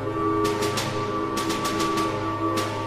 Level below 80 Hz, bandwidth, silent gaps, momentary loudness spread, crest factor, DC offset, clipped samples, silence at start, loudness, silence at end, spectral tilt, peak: -48 dBFS; 15.5 kHz; none; 3 LU; 14 dB; under 0.1%; under 0.1%; 0 s; -25 LUFS; 0 s; -4.5 dB/octave; -10 dBFS